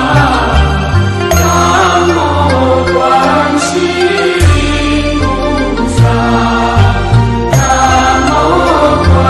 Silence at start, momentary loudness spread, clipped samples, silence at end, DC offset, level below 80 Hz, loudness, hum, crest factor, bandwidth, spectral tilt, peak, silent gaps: 0 s; 4 LU; under 0.1%; 0 s; under 0.1%; -18 dBFS; -9 LUFS; none; 8 dB; 12.5 kHz; -5.5 dB/octave; 0 dBFS; none